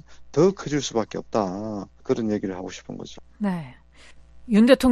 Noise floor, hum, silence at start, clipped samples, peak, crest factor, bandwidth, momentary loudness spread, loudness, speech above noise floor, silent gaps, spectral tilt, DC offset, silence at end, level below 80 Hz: -48 dBFS; none; 0.1 s; under 0.1%; -2 dBFS; 20 dB; 12.5 kHz; 17 LU; -24 LUFS; 25 dB; none; -6 dB/octave; under 0.1%; 0 s; -52 dBFS